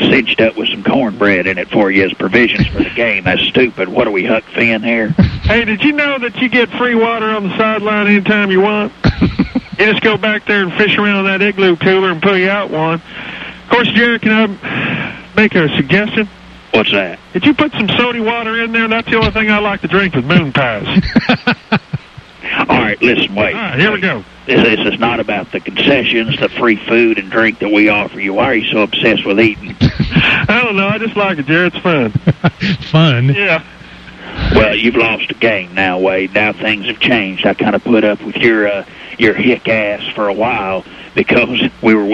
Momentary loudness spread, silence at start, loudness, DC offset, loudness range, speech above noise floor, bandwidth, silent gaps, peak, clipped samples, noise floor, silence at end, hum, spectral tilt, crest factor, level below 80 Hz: 6 LU; 0 s; -12 LUFS; under 0.1%; 2 LU; 21 dB; 7.6 kHz; none; 0 dBFS; under 0.1%; -33 dBFS; 0 s; none; -7 dB/octave; 12 dB; -34 dBFS